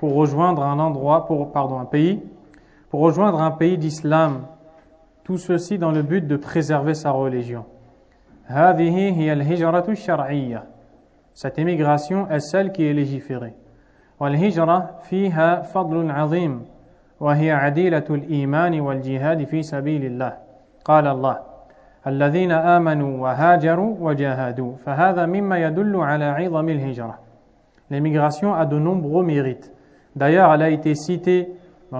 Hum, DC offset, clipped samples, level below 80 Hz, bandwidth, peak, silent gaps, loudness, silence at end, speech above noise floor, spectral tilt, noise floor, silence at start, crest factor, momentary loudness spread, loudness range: none; under 0.1%; under 0.1%; -58 dBFS; 8 kHz; 0 dBFS; none; -20 LUFS; 0 s; 36 dB; -8 dB/octave; -55 dBFS; 0 s; 20 dB; 12 LU; 4 LU